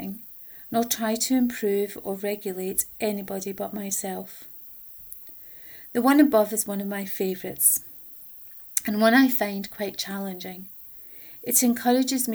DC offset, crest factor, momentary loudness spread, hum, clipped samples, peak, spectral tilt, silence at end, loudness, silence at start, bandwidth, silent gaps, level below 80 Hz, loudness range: under 0.1%; 26 dB; 18 LU; none; under 0.1%; 0 dBFS; -3 dB/octave; 0 s; -24 LUFS; 0 s; over 20 kHz; none; -64 dBFS; 6 LU